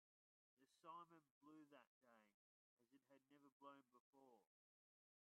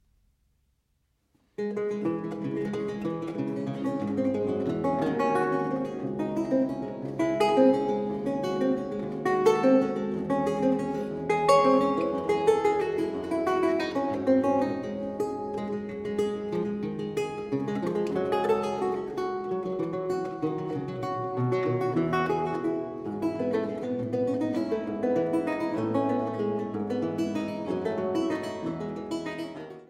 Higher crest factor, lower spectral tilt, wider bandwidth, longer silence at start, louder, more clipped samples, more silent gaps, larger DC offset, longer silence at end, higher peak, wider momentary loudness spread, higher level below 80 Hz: about the same, 22 dB vs 20 dB; second, -2 dB/octave vs -7 dB/octave; second, 3.5 kHz vs 13 kHz; second, 0.55 s vs 1.6 s; second, -66 LUFS vs -28 LUFS; neither; first, 1.31-1.41 s, 1.87-2.01 s, 2.34-2.77 s, 3.52-3.60 s, 4.00-4.13 s vs none; neither; first, 0.85 s vs 0.05 s; second, -50 dBFS vs -8 dBFS; about the same, 7 LU vs 9 LU; second, under -90 dBFS vs -62 dBFS